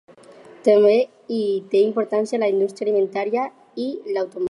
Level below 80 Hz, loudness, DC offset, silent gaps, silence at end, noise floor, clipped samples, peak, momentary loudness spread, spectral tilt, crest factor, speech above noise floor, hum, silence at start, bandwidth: -78 dBFS; -21 LUFS; under 0.1%; none; 0 s; -45 dBFS; under 0.1%; -6 dBFS; 11 LU; -6 dB/octave; 16 dB; 26 dB; none; 0.65 s; 11 kHz